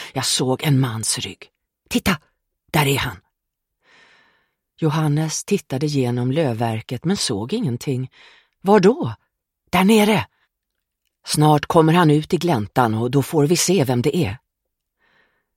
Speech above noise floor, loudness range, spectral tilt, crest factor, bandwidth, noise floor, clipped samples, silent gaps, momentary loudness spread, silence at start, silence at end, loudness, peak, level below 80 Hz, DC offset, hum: 61 dB; 7 LU; -5 dB/octave; 20 dB; 16.5 kHz; -79 dBFS; under 0.1%; none; 11 LU; 0 s; 1.2 s; -19 LUFS; 0 dBFS; -50 dBFS; under 0.1%; none